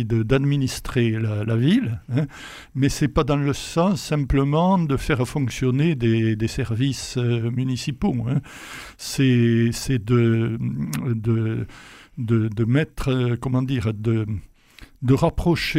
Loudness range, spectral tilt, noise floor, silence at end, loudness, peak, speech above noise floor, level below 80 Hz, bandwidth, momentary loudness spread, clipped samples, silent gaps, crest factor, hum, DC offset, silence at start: 3 LU; -6.5 dB/octave; -48 dBFS; 0 s; -22 LUFS; -4 dBFS; 26 dB; -38 dBFS; 15.5 kHz; 8 LU; under 0.1%; none; 16 dB; none; under 0.1%; 0 s